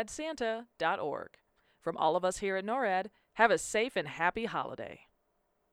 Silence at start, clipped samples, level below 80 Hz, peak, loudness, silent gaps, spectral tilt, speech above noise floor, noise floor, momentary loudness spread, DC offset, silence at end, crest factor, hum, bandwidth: 0 s; under 0.1%; -66 dBFS; -10 dBFS; -32 LUFS; none; -3.5 dB/octave; 44 dB; -77 dBFS; 14 LU; under 0.1%; 0.75 s; 24 dB; none; 15 kHz